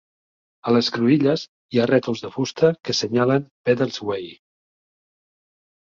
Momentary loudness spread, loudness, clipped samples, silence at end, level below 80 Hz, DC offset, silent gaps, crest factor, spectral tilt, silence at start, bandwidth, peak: 9 LU; -21 LUFS; under 0.1%; 1.65 s; -62 dBFS; under 0.1%; 1.48-1.69 s, 3.51-3.64 s; 18 dB; -5.5 dB/octave; 0.65 s; 7.6 kHz; -4 dBFS